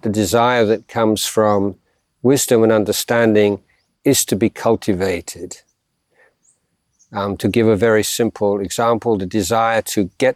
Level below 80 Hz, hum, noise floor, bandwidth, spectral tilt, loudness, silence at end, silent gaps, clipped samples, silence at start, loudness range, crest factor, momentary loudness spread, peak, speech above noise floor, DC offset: -52 dBFS; none; -66 dBFS; 16.5 kHz; -4.5 dB/octave; -17 LUFS; 0 s; none; under 0.1%; 0.05 s; 5 LU; 16 dB; 10 LU; -2 dBFS; 50 dB; under 0.1%